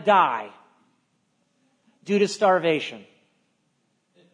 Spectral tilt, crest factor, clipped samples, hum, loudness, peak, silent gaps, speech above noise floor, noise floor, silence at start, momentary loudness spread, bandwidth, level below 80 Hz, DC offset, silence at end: -4.5 dB/octave; 22 dB; under 0.1%; none; -22 LUFS; -4 dBFS; none; 49 dB; -70 dBFS; 0 s; 23 LU; 10.5 kHz; -84 dBFS; under 0.1%; 1.35 s